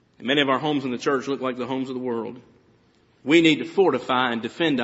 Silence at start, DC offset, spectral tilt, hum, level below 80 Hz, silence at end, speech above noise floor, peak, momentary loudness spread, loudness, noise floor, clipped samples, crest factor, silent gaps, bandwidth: 0.2 s; under 0.1%; -3 dB/octave; none; -68 dBFS; 0 s; 37 dB; -4 dBFS; 11 LU; -22 LUFS; -60 dBFS; under 0.1%; 20 dB; none; 8 kHz